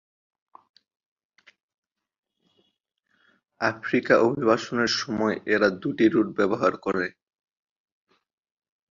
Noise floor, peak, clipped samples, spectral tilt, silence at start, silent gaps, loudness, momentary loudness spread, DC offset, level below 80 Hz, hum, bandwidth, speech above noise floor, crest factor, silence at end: -74 dBFS; -4 dBFS; under 0.1%; -5 dB/octave; 3.6 s; none; -24 LUFS; 7 LU; under 0.1%; -66 dBFS; none; 7.4 kHz; 51 dB; 22 dB; 1.8 s